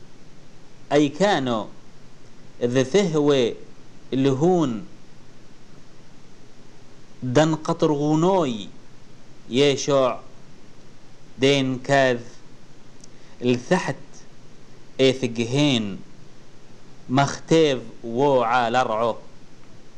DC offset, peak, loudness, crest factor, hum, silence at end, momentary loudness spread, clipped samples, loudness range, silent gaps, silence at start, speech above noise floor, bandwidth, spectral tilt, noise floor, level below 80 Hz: 1%; -6 dBFS; -21 LUFS; 18 dB; none; 0.05 s; 12 LU; under 0.1%; 4 LU; none; 0 s; 22 dB; 10.5 kHz; -5.5 dB/octave; -43 dBFS; -50 dBFS